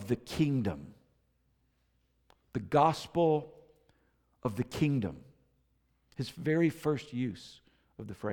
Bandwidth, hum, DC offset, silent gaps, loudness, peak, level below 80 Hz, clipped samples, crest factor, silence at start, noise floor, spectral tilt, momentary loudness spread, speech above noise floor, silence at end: 18.5 kHz; none; under 0.1%; none; -32 LUFS; -14 dBFS; -62 dBFS; under 0.1%; 20 dB; 0 s; -74 dBFS; -7 dB/octave; 20 LU; 42 dB; 0 s